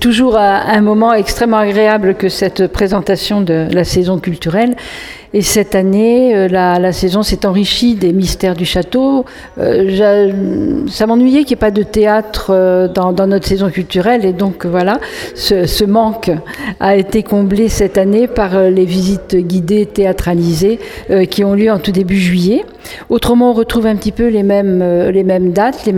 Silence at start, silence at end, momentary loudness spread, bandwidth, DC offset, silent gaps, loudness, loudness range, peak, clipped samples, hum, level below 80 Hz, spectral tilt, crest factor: 0 s; 0 s; 5 LU; 17.5 kHz; under 0.1%; none; -12 LUFS; 2 LU; 0 dBFS; under 0.1%; none; -30 dBFS; -5.5 dB/octave; 12 dB